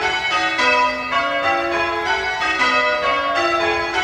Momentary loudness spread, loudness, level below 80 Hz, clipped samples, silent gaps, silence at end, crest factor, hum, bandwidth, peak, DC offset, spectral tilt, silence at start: 4 LU; -17 LUFS; -48 dBFS; under 0.1%; none; 0 s; 14 dB; none; 16 kHz; -4 dBFS; under 0.1%; -2.5 dB/octave; 0 s